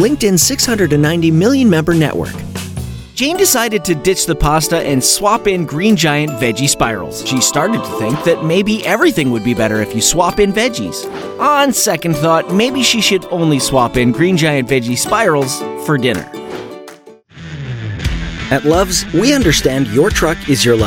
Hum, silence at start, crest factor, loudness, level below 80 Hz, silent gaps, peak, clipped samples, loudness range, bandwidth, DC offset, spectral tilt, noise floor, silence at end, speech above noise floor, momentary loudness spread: none; 0 s; 14 dB; -13 LUFS; -32 dBFS; none; 0 dBFS; under 0.1%; 4 LU; 18.5 kHz; under 0.1%; -4 dB/octave; -38 dBFS; 0 s; 25 dB; 11 LU